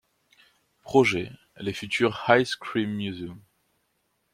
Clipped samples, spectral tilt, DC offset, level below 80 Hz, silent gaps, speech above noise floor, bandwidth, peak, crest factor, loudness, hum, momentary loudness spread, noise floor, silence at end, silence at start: under 0.1%; -5 dB/octave; under 0.1%; -64 dBFS; none; 48 dB; 15 kHz; -4 dBFS; 24 dB; -25 LUFS; none; 15 LU; -73 dBFS; 0.95 s; 0.85 s